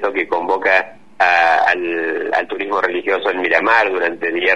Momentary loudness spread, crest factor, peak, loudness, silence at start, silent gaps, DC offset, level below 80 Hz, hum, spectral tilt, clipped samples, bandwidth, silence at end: 7 LU; 16 dB; 0 dBFS; -16 LUFS; 0 s; none; 0.8%; -60 dBFS; none; -4 dB/octave; under 0.1%; 9.2 kHz; 0 s